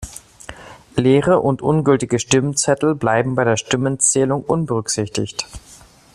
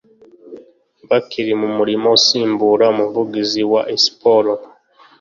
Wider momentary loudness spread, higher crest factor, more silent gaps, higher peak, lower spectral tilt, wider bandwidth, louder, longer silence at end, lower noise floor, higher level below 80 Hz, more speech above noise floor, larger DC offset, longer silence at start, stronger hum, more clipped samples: first, 17 LU vs 8 LU; about the same, 18 dB vs 16 dB; neither; about the same, -2 dBFS vs 0 dBFS; about the same, -4.5 dB/octave vs -3.5 dB/octave; first, 14 kHz vs 7.4 kHz; about the same, -17 LUFS vs -15 LUFS; second, 0.4 s vs 0.55 s; second, -38 dBFS vs -46 dBFS; first, -46 dBFS vs -62 dBFS; second, 21 dB vs 31 dB; neither; second, 0 s vs 0.45 s; neither; neither